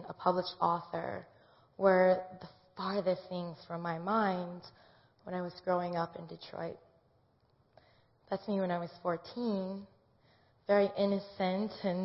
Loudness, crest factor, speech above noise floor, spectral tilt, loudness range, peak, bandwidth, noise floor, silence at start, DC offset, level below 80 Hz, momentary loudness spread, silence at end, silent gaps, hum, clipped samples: -34 LUFS; 22 dB; 37 dB; -5 dB/octave; 8 LU; -12 dBFS; 5.8 kHz; -70 dBFS; 0 s; under 0.1%; -74 dBFS; 17 LU; 0 s; none; none; under 0.1%